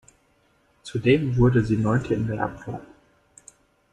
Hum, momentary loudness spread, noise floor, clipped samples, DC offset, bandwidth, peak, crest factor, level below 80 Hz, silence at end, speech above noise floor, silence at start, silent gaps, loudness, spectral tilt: none; 17 LU; -63 dBFS; under 0.1%; under 0.1%; 10.5 kHz; -6 dBFS; 18 dB; -44 dBFS; 1.05 s; 42 dB; 0.85 s; none; -23 LUFS; -8 dB/octave